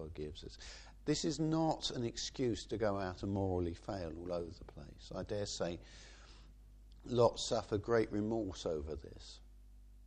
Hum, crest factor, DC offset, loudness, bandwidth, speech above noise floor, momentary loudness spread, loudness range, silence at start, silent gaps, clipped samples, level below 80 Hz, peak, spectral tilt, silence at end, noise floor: none; 22 dB; under 0.1%; -38 LUFS; 10 kHz; 20 dB; 20 LU; 6 LU; 0 s; none; under 0.1%; -56 dBFS; -16 dBFS; -5 dB/octave; 0 s; -58 dBFS